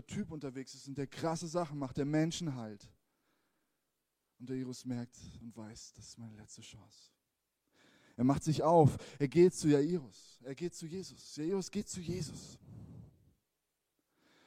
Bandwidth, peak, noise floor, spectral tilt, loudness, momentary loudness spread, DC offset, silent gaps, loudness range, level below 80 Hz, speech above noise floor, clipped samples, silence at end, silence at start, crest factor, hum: 15 kHz; -14 dBFS; -86 dBFS; -6.5 dB/octave; -35 LUFS; 25 LU; under 0.1%; none; 16 LU; -66 dBFS; 51 dB; under 0.1%; 1.4 s; 0.1 s; 24 dB; none